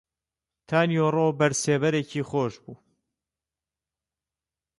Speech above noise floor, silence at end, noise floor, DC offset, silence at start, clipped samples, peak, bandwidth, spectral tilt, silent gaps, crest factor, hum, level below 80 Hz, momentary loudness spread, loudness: over 66 dB; 2.05 s; under -90 dBFS; under 0.1%; 0.7 s; under 0.1%; -10 dBFS; 11.5 kHz; -5 dB/octave; none; 18 dB; none; -66 dBFS; 6 LU; -24 LUFS